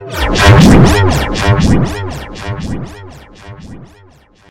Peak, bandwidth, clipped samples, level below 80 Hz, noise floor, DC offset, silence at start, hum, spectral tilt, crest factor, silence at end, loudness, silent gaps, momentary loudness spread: 0 dBFS; 16 kHz; 2%; -22 dBFS; -44 dBFS; under 0.1%; 0 s; none; -6 dB/octave; 12 dB; 0 s; -9 LUFS; none; 19 LU